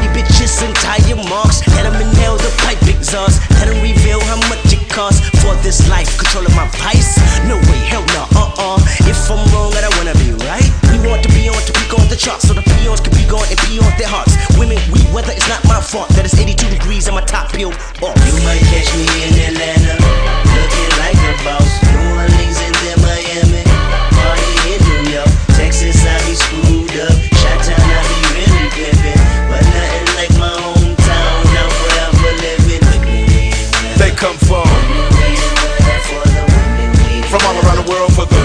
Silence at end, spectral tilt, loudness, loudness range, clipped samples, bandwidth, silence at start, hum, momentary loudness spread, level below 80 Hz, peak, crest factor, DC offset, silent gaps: 0 s; -4.5 dB/octave; -11 LUFS; 1 LU; under 0.1%; 10.5 kHz; 0 s; none; 3 LU; -12 dBFS; 0 dBFS; 10 dB; under 0.1%; none